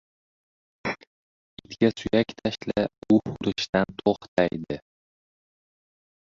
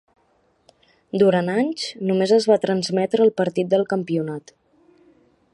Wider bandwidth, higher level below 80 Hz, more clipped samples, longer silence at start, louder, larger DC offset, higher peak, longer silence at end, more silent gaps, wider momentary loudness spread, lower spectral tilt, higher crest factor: second, 7.6 kHz vs 11 kHz; first, -56 dBFS vs -68 dBFS; neither; second, 0.85 s vs 1.15 s; second, -26 LUFS vs -20 LUFS; neither; about the same, -6 dBFS vs -4 dBFS; first, 1.6 s vs 1.15 s; first, 1.07-1.57 s, 3.69-3.73 s, 4.28-4.36 s vs none; first, 12 LU vs 8 LU; about the same, -6 dB/octave vs -6 dB/octave; about the same, 22 dB vs 18 dB